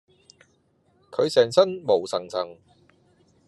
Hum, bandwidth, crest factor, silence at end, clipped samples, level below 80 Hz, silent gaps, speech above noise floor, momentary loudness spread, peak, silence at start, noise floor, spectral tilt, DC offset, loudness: none; 12 kHz; 22 dB; 0.95 s; under 0.1%; -76 dBFS; none; 43 dB; 13 LU; -4 dBFS; 1.1 s; -65 dBFS; -4.5 dB/octave; under 0.1%; -23 LUFS